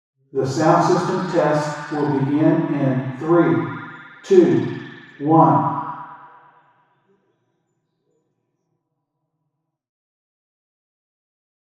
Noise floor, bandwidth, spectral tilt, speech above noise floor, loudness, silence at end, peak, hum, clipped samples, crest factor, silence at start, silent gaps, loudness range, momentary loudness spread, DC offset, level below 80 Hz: -76 dBFS; 10 kHz; -7.5 dB/octave; 59 dB; -18 LUFS; 5.5 s; 0 dBFS; none; under 0.1%; 22 dB; 0.35 s; none; 4 LU; 19 LU; under 0.1%; -70 dBFS